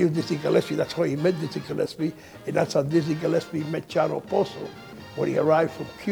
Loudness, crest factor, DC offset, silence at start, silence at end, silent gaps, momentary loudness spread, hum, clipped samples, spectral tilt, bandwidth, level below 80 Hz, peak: -25 LUFS; 18 dB; under 0.1%; 0 s; 0 s; none; 9 LU; none; under 0.1%; -6.5 dB/octave; 20 kHz; -62 dBFS; -8 dBFS